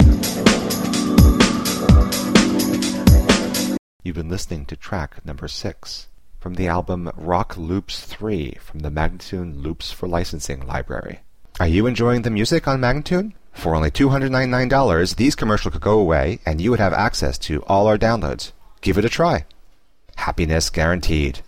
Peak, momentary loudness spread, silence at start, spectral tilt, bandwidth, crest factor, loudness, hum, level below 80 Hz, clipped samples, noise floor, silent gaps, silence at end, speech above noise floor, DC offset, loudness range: 0 dBFS; 14 LU; 0 s; -5.5 dB/octave; 16 kHz; 18 dB; -19 LUFS; none; -26 dBFS; under 0.1%; -52 dBFS; 3.79-4.00 s; 0 s; 32 dB; 0.6%; 10 LU